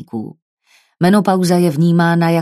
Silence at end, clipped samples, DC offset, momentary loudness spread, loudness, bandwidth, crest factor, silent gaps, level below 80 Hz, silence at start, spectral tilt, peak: 0 s; under 0.1%; under 0.1%; 15 LU; -13 LUFS; 14 kHz; 14 dB; 0.42-0.57 s; -60 dBFS; 0 s; -7 dB/octave; 0 dBFS